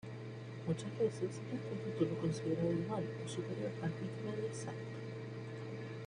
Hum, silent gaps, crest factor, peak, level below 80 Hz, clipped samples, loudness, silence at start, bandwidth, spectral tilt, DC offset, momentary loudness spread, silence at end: none; none; 18 dB; -22 dBFS; -70 dBFS; under 0.1%; -41 LUFS; 0.05 s; 10.5 kHz; -7 dB/octave; under 0.1%; 9 LU; 0 s